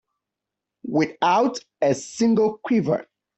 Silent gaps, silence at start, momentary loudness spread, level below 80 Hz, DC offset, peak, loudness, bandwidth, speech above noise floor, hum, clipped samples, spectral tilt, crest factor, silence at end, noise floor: none; 0.85 s; 7 LU; -66 dBFS; under 0.1%; -6 dBFS; -22 LUFS; 8.4 kHz; 64 dB; none; under 0.1%; -5.5 dB/octave; 16 dB; 0.35 s; -85 dBFS